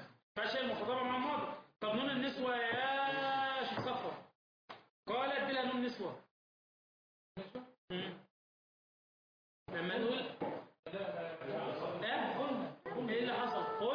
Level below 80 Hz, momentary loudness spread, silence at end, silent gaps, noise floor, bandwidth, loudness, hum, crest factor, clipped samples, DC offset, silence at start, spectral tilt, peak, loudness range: -78 dBFS; 13 LU; 0 s; 0.23-0.35 s, 4.35-4.68 s, 4.90-5.03 s, 6.31-7.35 s, 7.78-7.88 s, 8.31-9.66 s, 10.79-10.83 s; under -90 dBFS; 5.2 kHz; -39 LUFS; none; 14 dB; under 0.1%; under 0.1%; 0 s; -2 dB/octave; -26 dBFS; 11 LU